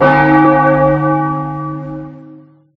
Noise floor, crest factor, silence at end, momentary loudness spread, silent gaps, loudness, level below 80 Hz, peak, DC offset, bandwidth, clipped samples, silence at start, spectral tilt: -39 dBFS; 12 dB; 0.4 s; 18 LU; none; -12 LUFS; -40 dBFS; 0 dBFS; under 0.1%; 5.6 kHz; under 0.1%; 0 s; -9.5 dB/octave